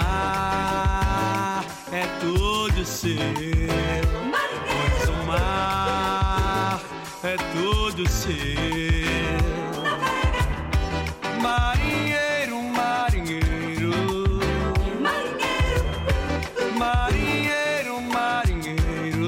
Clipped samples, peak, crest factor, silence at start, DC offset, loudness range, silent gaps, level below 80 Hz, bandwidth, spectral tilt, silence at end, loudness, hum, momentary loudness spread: under 0.1%; -10 dBFS; 14 dB; 0 s; under 0.1%; 1 LU; none; -30 dBFS; 16.5 kHz; -5 dB/octave; 0 s; -24 LUFS; none; 4 LU